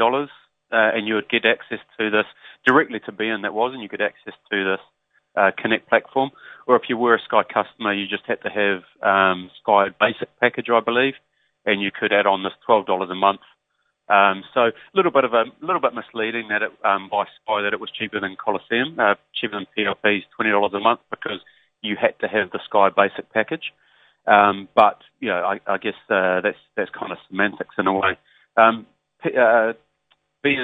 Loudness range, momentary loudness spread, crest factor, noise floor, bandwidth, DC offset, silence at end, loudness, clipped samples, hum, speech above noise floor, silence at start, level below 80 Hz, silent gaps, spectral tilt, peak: 3 LU; 10 LU; 22 dB; -72 dBFS; 4.9 kHz; under 0.1%; 0 s; -21 LUFS; under 0.1%; none; 51 dB; 0 s; -68 dBFS; none; -7 dB/octave; 0 dBFS